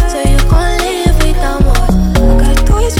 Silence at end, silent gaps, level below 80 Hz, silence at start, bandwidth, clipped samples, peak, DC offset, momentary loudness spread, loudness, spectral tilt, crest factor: 0 s; none; -10 dBFS; 0 s; 15.5 kHz; under 0.1%; 0 dBFS; under 0.1%; 3 LU; -12 LUFS; -5.5 dB/octave; 8 dB